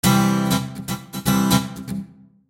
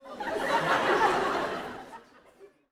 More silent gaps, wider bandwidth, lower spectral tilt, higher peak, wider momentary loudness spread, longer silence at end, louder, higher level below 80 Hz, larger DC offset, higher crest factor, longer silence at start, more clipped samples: neither; about the same, 17 kHz vs 17.5 kHz; about the same, -5 dB/octave vs -4 dB/octave; first, -4 dBFS vs -12 dBFS; second, 14 LU vs 17 LU; first, 0.45 s vs 0.25 s; first, -21 LUFS vs -27 LUFS; first, -44 dBFS vs -60 dBFS; neither; about the same, 18 dB vs 18 dB; about the same, 0.05 s vs 0.05 s; neither